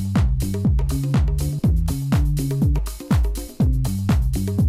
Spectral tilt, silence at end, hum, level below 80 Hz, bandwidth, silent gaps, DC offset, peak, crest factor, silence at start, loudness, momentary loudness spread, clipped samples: -7 dB/octave; 0 s; none; -24 dBFS; 15.5 kHz; none; under 0.1%; -8 dBFS; 12 dB; 0 s; -21 LUFS; 2 LU; under 0.1%